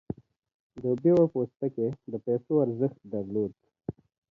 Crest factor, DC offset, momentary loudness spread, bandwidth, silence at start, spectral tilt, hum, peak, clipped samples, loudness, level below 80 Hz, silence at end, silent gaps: 18 dB; under 0.1%; 18 LU; 5.2 kHz; 0.1 s; -11.5 dB/octave; none; -12 dBFS; under 0.1%; -28 LUFS; -64 dBFS; 0.4 s; 0.54-0.70 s